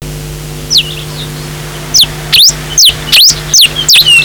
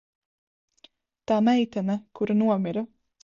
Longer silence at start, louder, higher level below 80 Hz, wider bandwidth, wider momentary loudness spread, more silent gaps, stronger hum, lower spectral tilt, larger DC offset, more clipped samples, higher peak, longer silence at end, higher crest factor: second, 0 s vs 1.3 s; first, -4 LUFS vs -25 LUFS; first, -30 dBFS vs -68 dBFS; first, over 20 kHz vs 7.2 kHz; first, 18 LU vs 12 LU; neither; neither; second, -0.5 dB/octave vs -7.5 dB/octave; neither; neither; first, 0 dBFS vs -10 dBFS; second, 0 s vs 0.4 s; second, 8 dB vs 16 dB